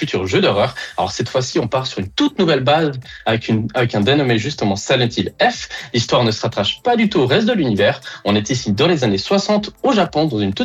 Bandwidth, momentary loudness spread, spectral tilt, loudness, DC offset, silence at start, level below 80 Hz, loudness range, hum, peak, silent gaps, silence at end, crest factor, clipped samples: 12.5 kHz; 6 LU; -5 dB/octave; -17 LUFS; under 0.1%; 0 s; -50 dBFS; 1 LU; none; -4 dBFS; none; 0 s; 14 dB; under 0.1%